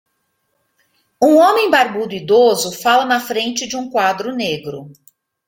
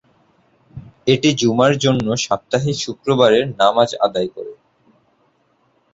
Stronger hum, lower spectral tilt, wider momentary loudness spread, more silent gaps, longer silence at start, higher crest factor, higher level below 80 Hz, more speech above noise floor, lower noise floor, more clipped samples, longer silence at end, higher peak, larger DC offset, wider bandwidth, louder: neither; second, -3 dB/octave vs -5 dB/octave; about the same, 11 LU vs 10 LU; neither; first, 1.2 s vs 0.75 s; about the same, 16 dB vs 18 dB; second, -62 dBFS vs -54 dBFS; first, 53 dB vs 45 dB; first, -68 dBFS vs -61 dBFS; neither; second, 0.55 s vs 1.4 s; about the same, 0 dBFS vs -2 dBFS; neither; first, 17 kHz vs 8 kHz; about the same, -15 LUFS vs -17 LUFS